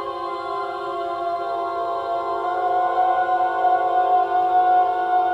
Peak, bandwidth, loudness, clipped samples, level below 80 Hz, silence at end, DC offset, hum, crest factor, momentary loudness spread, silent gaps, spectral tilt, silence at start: -8 dBFS; 5.8 kHz; -21 LUFS; under 0.1%; -62 dBFS; 0 s; under 0.1%; none; 12 dB; 9 LU; none; -5 dB/octave; 0 s